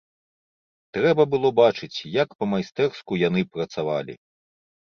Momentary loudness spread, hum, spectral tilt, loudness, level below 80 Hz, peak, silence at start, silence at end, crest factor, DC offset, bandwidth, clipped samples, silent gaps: 10 LU; none; -6.5 dB/octave; -23 LUFS; -62 dBFS; -4 dBFS; 0.95 s; 0.7 s; 20 dB; under 0.1%; 6.8 kHz; under 0.1%; 2.35-2.39 s